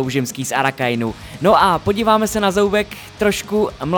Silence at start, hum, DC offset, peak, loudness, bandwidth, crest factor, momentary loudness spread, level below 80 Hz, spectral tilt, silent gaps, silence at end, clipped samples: 0 s; none; under 0.1%; -2 dBFS; -17 LUFS; over 20 kHz; 16 dB; 7 LU; -42 dBFS; -4.5 dB/octave; none; 0 s; under 0.1%